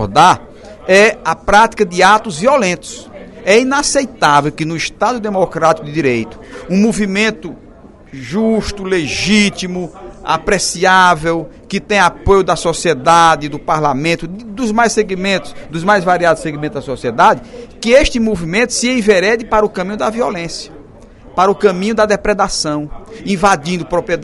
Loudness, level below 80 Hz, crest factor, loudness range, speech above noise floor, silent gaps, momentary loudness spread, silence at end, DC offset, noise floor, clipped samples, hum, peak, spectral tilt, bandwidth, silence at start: -13 LUFS; -34 dBFS; 14 dB; 4 LU; 24 dB; none; 13 LU; 0 s; under 0.1%; -38 dBFS; 0.2%; none; 0 dBFS; -4 dB/octave; 12 kHz; 0 s